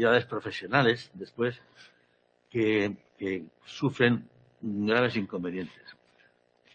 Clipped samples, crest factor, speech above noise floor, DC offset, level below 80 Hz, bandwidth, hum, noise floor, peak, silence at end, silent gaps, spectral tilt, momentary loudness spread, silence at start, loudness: under 0.1%; 22 dB; 40 dB; under 0.1%; -68 dBFS; 8.6 kHz; 60 Hz at -50 dBFS; -68 dBFS; -6 dBFS; 0.8 s; none; -6.5 dB/octave; 14 LU; 0 s; -29 LUFS